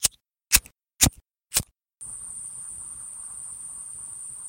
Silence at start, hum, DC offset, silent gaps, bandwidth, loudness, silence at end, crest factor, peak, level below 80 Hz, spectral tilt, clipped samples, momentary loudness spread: 0 s; none; under 0.1%; none; 17 kHz; -26 LUFS; 0 s; 30 dB; 0 dBFS; -44 dBFS; -1 dB/octave; under 0.1%; 15 LU